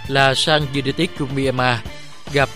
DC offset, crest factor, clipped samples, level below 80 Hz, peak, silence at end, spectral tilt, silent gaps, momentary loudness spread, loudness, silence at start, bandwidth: 2%; 20 dB; under 0.1%; -42 dBFS; 0 dBFS; 0 s; -4.5 dB/octave; none; 10 LU; -18 LUFS; 0 s; 15.5 kHz